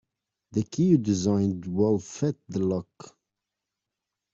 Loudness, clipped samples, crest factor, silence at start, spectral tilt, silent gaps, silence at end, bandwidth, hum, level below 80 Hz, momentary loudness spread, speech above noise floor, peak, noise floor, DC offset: -26 LUFS; under 0.1%; 18 dB; 0.55 s; -7.5 dB/octave; none; 1.25 s; 7.8 kHz; none; -62 dBFS; 9 LU; 61 dB; -10 dBFS; -86 dBFS; under 0.1%